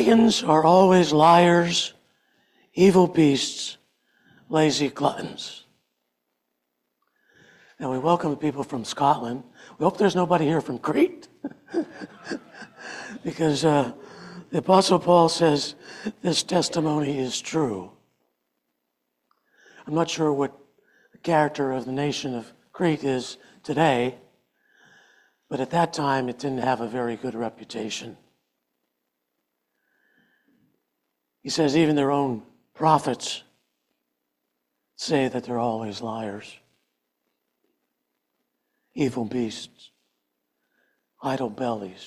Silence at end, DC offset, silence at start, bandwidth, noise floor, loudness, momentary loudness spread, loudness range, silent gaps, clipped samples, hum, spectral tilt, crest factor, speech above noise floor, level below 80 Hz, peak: 0 s; under 0.1%; 0 s; 13.5 kHz; -79 dBFS; -23 LUFS; 18 LU; 12 LU; none; under 0.1%; none; -5 dB/octave; 20 dB; 56 dB; -64 dBFS; -4 dBFS